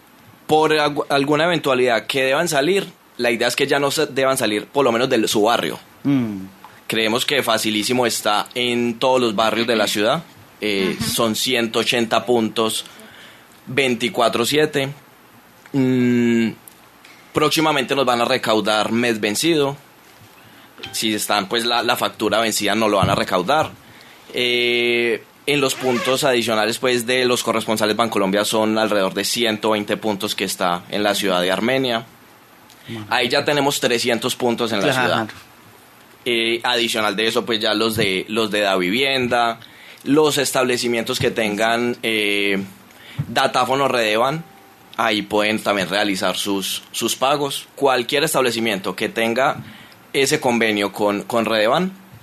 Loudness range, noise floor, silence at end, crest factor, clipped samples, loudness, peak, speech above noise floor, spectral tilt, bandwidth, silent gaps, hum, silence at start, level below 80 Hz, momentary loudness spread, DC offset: 2 LU; -48 dBFS; 0.05 s; 18 dB; under 0.1%; -19 LUFS; 0 dBFS; 29 dB; -3.5 dB/octave; 14 kHz; none; none; 0.5 s; -58 dBFS; 6 LU; under 0.1%